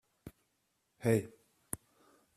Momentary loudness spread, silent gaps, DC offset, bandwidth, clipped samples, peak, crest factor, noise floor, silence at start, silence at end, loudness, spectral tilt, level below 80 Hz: 24 LU; none; under 0.1%; 14.5 kHz; under 0.1%; -16 dBFS; 24 dB; -80 dBFS; 0.25 s; 0.6 s; -36 LUFS; -6.5 dB/octave; -68 dBFS